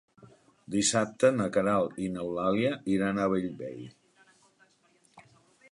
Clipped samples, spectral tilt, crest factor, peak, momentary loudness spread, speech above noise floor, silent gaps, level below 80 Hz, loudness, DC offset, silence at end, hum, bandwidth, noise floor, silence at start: under 0.1%; -4.5 dB/octave; 20 dB; -10 dBFS; 14 LU; 38 dB; none; -64 dBFS; -28 LUFS; under 0.1%; 0.5 s; none; 11.5 kHz; -66 dBFS; 0.2 s